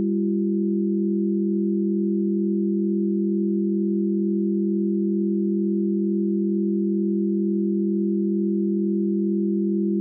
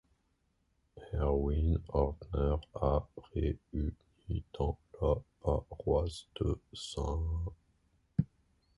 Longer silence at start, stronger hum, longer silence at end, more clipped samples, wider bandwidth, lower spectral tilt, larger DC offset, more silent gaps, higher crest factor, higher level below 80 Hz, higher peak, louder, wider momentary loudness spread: second, 0 s vs 0.95 s; neither; second, 0 s vs 0.55 s; neither; second, 0.5 kHz vs 11.5 kHz; first, -18 dB/octave vs -8 dB/octave; neither; neither; second, 8 dB vs 20 dB; second, -82 dBFS vs -40 dBFS; about the same, -14 dBFS vs -16 dBFS; first, -23 LUFS vs -36 LUFS; second, 0 LU vs 9 LU